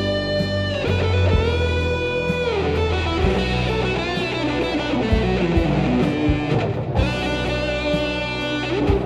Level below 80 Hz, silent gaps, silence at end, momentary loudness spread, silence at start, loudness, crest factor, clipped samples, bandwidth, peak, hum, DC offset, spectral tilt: -30 dBFS; none; 0 s; 3 LU; 0 s; -21 LUFS; 16 dB; under 0.1%; 10.5 kHz; -4 dBFS; none; 0.1%; -6.5 dB/octave